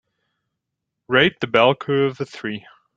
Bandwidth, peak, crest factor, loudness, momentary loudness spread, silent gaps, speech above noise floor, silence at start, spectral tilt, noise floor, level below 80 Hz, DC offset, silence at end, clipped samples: 7.6 kHz; 0 dBFS; 22 dB; -19 LUFS; 13 LU; none; 61 dB; 1.1 s; -6 dB/octave; -81 dBFS; -58 dBFS; under 0.1%; 0.35 s; under 0.1%